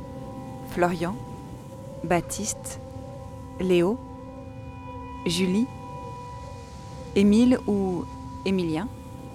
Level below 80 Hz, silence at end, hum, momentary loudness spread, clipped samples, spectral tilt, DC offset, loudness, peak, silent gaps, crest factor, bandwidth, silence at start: -48 dBFS; 0 s; none; 18 LU; under 0.1%; -5.5 dB/octave; under 0.1%; -25 LUFS; -8 dBFS; none; 18 dB; 15.5 kHz; 0 s